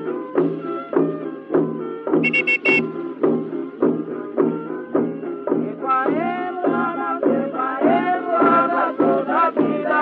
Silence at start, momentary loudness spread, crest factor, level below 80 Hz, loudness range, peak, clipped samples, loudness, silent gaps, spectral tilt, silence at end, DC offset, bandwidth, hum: 0 s; 9 LU; 16 dB; -76 dBFS; 4 LU; -4 dBFS; under 0.1%; -20 LUFS; none; -8 dB/octave; 0 s; under 0.1%; 8 kHz; none